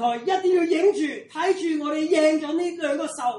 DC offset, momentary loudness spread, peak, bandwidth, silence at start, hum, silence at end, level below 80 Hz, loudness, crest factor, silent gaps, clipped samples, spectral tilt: under 0.1%; 7 LU; -8 dBFS; 11.5 kHz; 0 s; none; 0 s; -74 dBFS; -23 LUFS; 14 dB; none; under 0.1%; -3 dB/octave